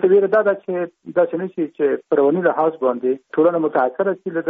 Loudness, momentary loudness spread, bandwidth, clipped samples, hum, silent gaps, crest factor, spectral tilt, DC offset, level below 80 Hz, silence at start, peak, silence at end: -19 LUFS; 7 LU; 3.8 kHz; under 0.1%; none; none; 14 dB; -6.5 dB/octave; under 0.1%; -70 dBFS; 0 s; -4 dBFS; 0 s